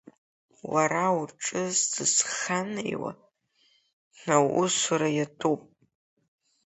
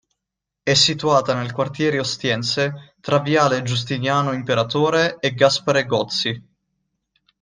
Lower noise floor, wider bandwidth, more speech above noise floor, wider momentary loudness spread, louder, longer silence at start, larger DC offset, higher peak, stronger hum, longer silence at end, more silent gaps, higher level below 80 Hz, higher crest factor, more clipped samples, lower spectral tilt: second, -67 dBFS vs -83 dBFS; second, 8.4 kHz vs 10 kHz; second, 41 dB vs 64 dB; about the same, 10 LU vs 8 LU; second, -26 LUFS vs -19 LUFS; about the same, 0.65 s vs 0.65 s; neither; second, -6 dBFS vs -2 dBFS; neither; about the same, 1.05 s vs 1 s; first, 3.93-4.11 s vs none; second, -72 dBFS vs -58 dBFS; about the same, 22 dB vs 18 dB; neither; about the same, -3 dB/octave vs -4 dB/octave